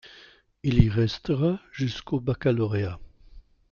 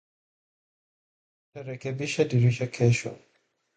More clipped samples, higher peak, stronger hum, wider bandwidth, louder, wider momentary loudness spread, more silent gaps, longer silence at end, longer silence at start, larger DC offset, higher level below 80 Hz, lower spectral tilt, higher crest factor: neither; first, -4 dBFS vs -8 dBFS; neither; second, 7 kHz vs 9.2 kHz; about the same, -26 LUFS vs -26 LUFS; second, 9 LU vs 16 LU; neither; second, 0.3 s vs 0.6 s; second, 0.05 s vs 1.55 s; neither; first, -40 dBFS vs -62 dBFS; first, -8 dB/octave vs -6.5 dB/octave; about the same, 22 dB vs 20 dB